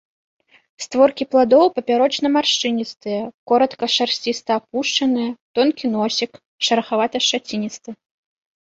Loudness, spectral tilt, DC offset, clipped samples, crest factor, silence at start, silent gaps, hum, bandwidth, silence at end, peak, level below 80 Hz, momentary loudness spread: -19 LUFS; -3 dB/octave; under 0.1%; under 0.1%; 18 dB; 0.8 s; 3.34-3.46 s, 5.41-5.54 s, 6.46-6.58 s; none; 8 kHz; 0.7 s; -2 dBFS; -66 dBFS; 11 LU